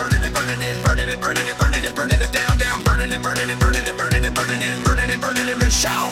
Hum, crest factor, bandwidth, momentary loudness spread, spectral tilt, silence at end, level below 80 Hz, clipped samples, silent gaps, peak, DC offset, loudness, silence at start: none; 14 dB; 17 kHz; 3 LU; -4 dB/octave; 0 s; -24 dBFS; under 0.1%; none; -4 dBFS; under 0.1%; -19 LUFS; 0 s